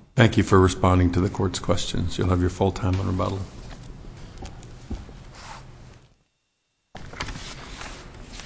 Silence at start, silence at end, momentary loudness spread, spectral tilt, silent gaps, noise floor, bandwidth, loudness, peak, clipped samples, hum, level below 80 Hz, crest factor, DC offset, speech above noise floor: 0.15 s; 0 s; 24 LU; -6 dB/octave; none; -74 dBFS; 8 kHz; -23 LUFS; -2 dBFS; under 0.1%; none; -36 dBFS; 22 dB; under 0.1%; 53 dB